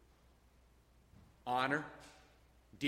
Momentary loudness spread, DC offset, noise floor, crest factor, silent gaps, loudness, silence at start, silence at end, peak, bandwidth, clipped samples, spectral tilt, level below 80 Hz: 22 LU; under 0.1%; -67 dBFS; 24 dB; none; -38 LUFS; 1.45 s; 0 s; -20 dBFS; 16 kHz; under 0.1%; -5 dB/octave; -70 dBFS